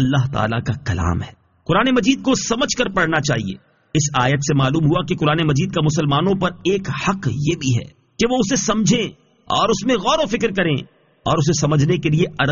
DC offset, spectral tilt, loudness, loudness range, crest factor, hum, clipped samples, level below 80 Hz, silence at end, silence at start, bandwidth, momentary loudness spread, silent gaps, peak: under 0.1%; -5 dB/octave; -18 LUFS; 1 LU; 16 dB; none; under 0.1%; -42 dBFS; 0 s; 0 s; 7.4 kHz; 6 LU; none; -2 dBFS